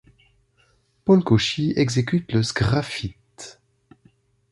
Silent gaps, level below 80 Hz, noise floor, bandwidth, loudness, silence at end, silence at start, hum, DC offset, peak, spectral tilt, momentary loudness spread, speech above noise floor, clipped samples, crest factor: none; -46 dBFS; -63 dBFS; 11.5 kHz; -21 LUFS; 1 s; 1.05 s; none; under 0.1%; -4 dBFS; -6 dB/octave; 23 LU; 43 dB; under 0.1%; 20 dB